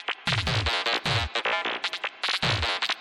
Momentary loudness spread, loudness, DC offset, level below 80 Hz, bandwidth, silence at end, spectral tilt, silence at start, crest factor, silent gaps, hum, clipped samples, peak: 4 LU; -26 LUFS; under 0.1%; -42 dBFS; 13 kHz; 0 s; -3.5 dB/octave; 0 s; 14 dB; none; none; under 0.1%; -14 dBFS